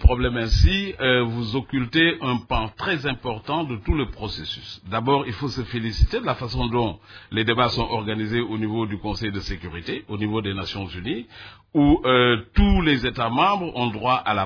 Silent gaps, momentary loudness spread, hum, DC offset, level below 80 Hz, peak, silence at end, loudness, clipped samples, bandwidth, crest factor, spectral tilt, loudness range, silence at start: none; 11 LU; none; under 0.1%; -30 dBFS; -2 dBFS; 0 s; -23 LUFS; under 0.1%; 5.4 kHz; 22 dB; -6.5 dB/octave; 6 LU; 0 s